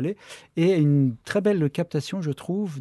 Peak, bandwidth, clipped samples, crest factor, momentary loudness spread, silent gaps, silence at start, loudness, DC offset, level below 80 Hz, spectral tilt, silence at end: -10 dBFS; 12.5 kHz; under 0.1%; 14 dB; 10 LU; none; 0 s; -24 LUFS; under 0.1%; -64 dBFS; -7.5 dB/octave; 0 s